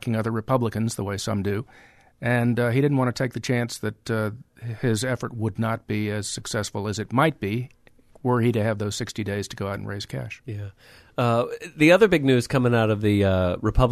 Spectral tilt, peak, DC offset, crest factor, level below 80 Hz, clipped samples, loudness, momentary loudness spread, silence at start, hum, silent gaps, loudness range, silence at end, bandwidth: -6 dB/octave; -4 dBFS; under 0.1%; 20 dB; -42 dBFS; under 0.1%; -24 LUFS; 11 LU; 0 s; none; none; 6 LU; 0 s; 13.5 kHz